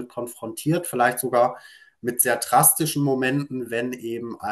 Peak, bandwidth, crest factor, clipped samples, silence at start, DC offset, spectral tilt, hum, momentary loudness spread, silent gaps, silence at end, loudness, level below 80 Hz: -2 dBFS; 13 kHz; 20 dB; under 0.1%; 0 s; under 0.1%; -4 dB/octave; none; 16 LU; none; 0 s; -22 LUFS; -66 dBFS